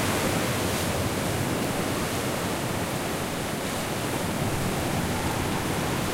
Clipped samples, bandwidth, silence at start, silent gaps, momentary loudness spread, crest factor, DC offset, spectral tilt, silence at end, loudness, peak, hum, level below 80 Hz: under 0.1%; 16 kHz; 0 s; none; 3 LU; 14 dB; under 0.1%; -4.5 dB/octave; 0 s; -27 LUFS; -14 dBFS; none; -44 dBFS